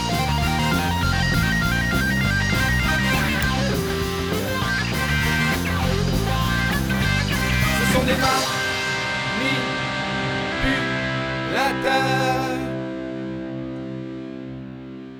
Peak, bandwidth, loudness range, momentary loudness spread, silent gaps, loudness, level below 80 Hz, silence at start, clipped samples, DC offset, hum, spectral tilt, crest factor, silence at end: -6 dBFS; over 20 kHz; 3 LU; 11 LU; none; -21 LUFS; -32 dBFS; 0 s; under 0.1%; under 0.1%; none; -4.5 dB/octave; 16 dB; 0 s